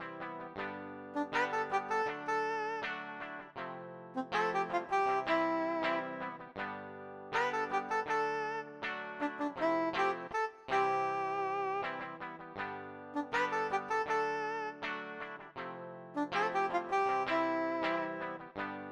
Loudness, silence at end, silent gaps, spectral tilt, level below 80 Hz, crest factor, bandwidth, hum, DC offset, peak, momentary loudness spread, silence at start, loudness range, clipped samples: -36 LUFS; 0 s; none; -4.5 dB/octave; -74 dBFS; 16 dB; 11 kHz; none; under 0.1%; -20 dBFS; 12 LU; 0 s; 2 LU; under 0.1%